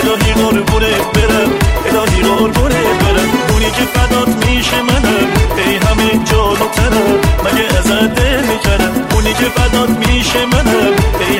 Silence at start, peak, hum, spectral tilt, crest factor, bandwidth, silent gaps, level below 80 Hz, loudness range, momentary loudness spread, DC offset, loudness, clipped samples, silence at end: 0 s; 0 dBFS; none; -4.5 dB/octave; 10 dB; 16.5 kHz; none; -18 dBFS; 0 LU; 2 LU; 0.2%; -11 LUFS; under 0.1%; 0 s